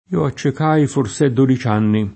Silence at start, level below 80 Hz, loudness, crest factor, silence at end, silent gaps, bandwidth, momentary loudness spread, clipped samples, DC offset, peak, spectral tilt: 0.1 s; -50 dBFS; -17 LUFS; 16 dB; 0 s; none; 8.8 kHz; 4 LU; under 0.1%; under 0.1%; -2 dBFS; -7 dB/octave